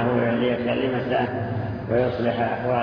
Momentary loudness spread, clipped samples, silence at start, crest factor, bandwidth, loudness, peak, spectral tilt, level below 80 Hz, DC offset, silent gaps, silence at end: 5 LU; under 0.1%; 0 s; 14 dB; 5.4 kHz; -24 LUFS; -10 dBFS; -9.5 dB/octave; -50 dBFS; under 0.1%; none; 0 s